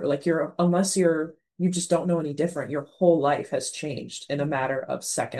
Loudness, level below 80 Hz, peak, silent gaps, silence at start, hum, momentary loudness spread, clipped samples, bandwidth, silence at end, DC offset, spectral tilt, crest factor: -25 LUFS; -72 dBFS; -6 dBFS; none; 0 s; none; 10 LU; under 0.1%; 12.5 kHz; 0 s; under 0.1%; -5 dB/octave; 18 dB